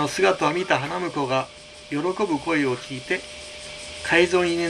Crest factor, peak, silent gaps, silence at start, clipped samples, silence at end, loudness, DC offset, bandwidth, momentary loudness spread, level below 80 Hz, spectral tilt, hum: 20 dB; -4 dBFS; none; 0 s; under 0.1%; 0 s; -23 LUFS; under 0.1%; 12.5 kHz; 16 LU; -54 dBFS; -4.5 dB/octave; none